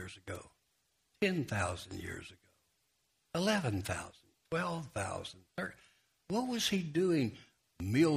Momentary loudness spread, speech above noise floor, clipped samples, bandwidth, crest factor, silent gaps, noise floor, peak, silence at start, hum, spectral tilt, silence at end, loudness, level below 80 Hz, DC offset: 14 LU; 43 dB; under 0.1%; 15.5 kHz; 20 dB; none; -78 dBFS; -18 dBFS; 0 s; none; -5 dB/octave; 0 s; -36 LUFS; -64 dBFS; under 0.1%